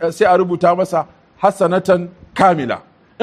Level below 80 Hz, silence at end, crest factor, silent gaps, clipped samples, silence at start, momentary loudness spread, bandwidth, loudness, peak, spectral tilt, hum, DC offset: -56 dBFS; 0 s; 16 dB; none; under 0.1%; 0 s; 11 LU; 13.5 kHz; -15 LUFS; 0 dBFS; -6.5 dB/octave; none; under 0.1%